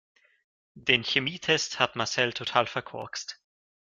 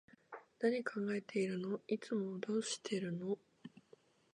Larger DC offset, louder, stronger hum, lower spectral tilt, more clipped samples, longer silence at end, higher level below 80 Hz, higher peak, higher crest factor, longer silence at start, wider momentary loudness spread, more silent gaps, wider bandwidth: neither; first, -27 LUFS vs -40 LUFS; neither; second, -2.5 dB/octave vs -5 dB/octave; neither; about the same, 0.45 s vs 0.55 s; first, -68 dBFS vs -88 dBFS; first, -4 dBFS vs -22 dBFS; first, 26 dB vs 18 dB; first, 0.75 s vs 0.3 s; second, 13 LU vs 19 LU; neither; about the same, 9.6 kHz vs 10.5 kHz